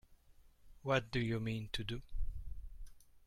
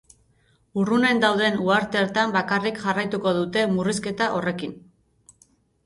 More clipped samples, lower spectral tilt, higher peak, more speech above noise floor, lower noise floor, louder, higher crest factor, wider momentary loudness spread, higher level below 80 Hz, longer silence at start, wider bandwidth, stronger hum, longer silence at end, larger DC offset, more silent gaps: neither; about the same, -6 dB/octave vs -5 dB/octave; second, -20 dBFS vs -4 dBFS; second, 26 dB vs 40 dB; about the same, -64 dBFS vs -63 dBFS; second, -40 LUFS vs -22 LUFS; about the same, 22 dB vs 20 dB; first, 19 LU vs 7 LU; first, -48 dBFS vs -60 dBFS; second, 0.1 s vs 0.75 s; first, 14 kHz vs 11.5 kHz; neither; second, 0.1 s vs 1.05 s; neither; neither